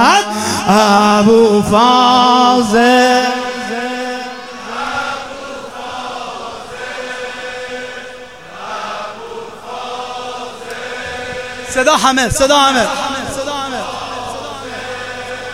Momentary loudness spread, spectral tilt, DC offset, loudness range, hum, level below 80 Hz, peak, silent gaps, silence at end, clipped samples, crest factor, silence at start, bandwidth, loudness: 18 LU; -3.5 dB/octave; 0.5%; 15 LU; none; -42 dBFS; 0 dBFS; none; 0 s; under 0.1%; 14 dB; 0 s; 16.5 kHz; -14 LUFS